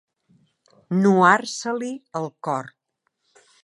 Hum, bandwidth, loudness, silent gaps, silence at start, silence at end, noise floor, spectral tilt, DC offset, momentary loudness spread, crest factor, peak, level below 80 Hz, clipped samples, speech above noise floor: none; 11.5 kHz; -21 LUFS; none; 0.9 s; 0.95 s; -73 dBFS; -5.5 dB/octave; under 0.1%; 14 LU; 22 dB; -2 dBFS; -74 dBFS; under 0.1%; 53 dB